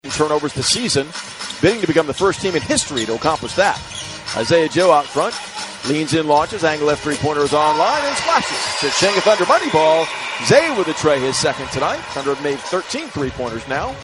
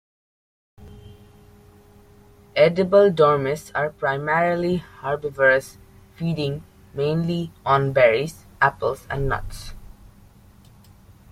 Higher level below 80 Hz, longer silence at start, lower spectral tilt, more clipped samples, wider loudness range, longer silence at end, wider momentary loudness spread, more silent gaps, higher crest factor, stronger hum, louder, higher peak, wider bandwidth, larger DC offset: about the same, -48 dBFS vs -44 dBFS; second, 0.05 s vs 0.8 s; second, -3.5 dB/octave vs -6.5 dB/octave; neither; about the same, 3 LU vs 4 LU; second, 0 s vs 1.45 s; second, 9 LU vs 13 LU; neither; about the same, 18 dB vs 20 dB; neither; first, -17 LUFS vs -21 LUFS; first, 0 dBFS vs -4 dBFS; second, 11.5 kHz vs 15.5 kHz; neither